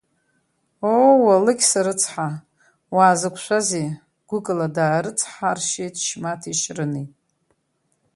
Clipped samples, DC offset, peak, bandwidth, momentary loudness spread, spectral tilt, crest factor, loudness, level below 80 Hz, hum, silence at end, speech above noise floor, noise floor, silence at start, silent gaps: under 0.1%; under 0.1%; -2 dBFS; 11.5 kHz; 14 LU; -4 dB/octave; 20 dB; -20 LUFS; -68 dBFS; none; 1.05 s; 49 dB; -70 dBFS; 0.8 s; none